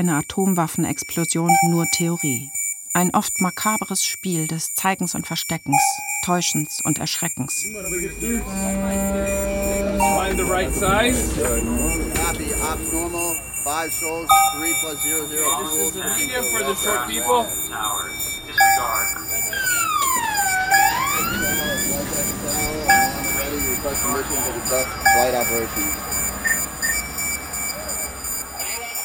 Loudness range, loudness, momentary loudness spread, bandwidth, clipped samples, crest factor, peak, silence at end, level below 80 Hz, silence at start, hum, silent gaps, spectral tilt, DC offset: 3 LU; -20 LUFS; 7 LU; 17 kHz; under 0.1%; 20 dB; 0 dBFS; 0 s; -38 dBFS; 0 s; none; none; -3 dB/octave; under 0.1%